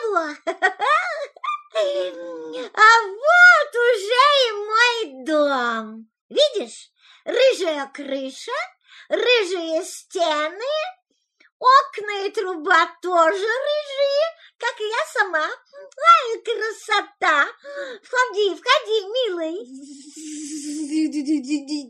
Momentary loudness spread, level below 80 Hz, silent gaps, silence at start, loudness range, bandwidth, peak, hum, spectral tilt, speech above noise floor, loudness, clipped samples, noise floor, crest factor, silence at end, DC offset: 16 LU; -86 dBFS; 6.21-6.29 s, 11.52-11.60 s; 0 s; 8 LU; 13 kHz; -2 dBFS; none; -0.5 dB/octave; 25 dB; -19 LUFS; under 0.1%; -48 dBFS; 18 dB; 0 s; under 0.1%